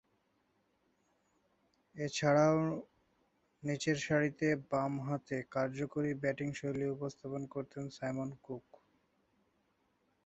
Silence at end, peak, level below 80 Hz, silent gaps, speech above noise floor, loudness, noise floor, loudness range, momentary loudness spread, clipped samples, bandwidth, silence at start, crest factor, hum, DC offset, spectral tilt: 1.65 s; -16 dBFS; -72 dBFS; none; 42 dB; -36 LUFS; -77 dBFS; 8 LU; 14 LU; under 0.1%; 8 kHz; 1.95 s; 22 dB; none; under 0.1%; -5.5 dB/octave